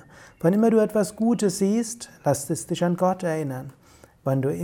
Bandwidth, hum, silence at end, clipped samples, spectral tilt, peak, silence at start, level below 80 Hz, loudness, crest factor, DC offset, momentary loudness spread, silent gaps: 17.5 kHz; none; 0 s; under 0.1%; -6 dB/octave; -8 dBFS; 0.2 s; -60 dBFS; -24 LUFS; 16 dB; under 0.1%; 12 LU; none